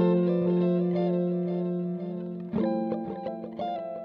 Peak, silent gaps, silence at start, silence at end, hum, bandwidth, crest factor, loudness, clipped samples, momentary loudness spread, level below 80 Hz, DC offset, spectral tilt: -14 dBFS; none; 0 s; 0 s; none; 5 kHz; 14 dB; -29 LUFS; under 0.1%; 10 LU; -66 dBFS; under 0.1%; -11.5 dB/octave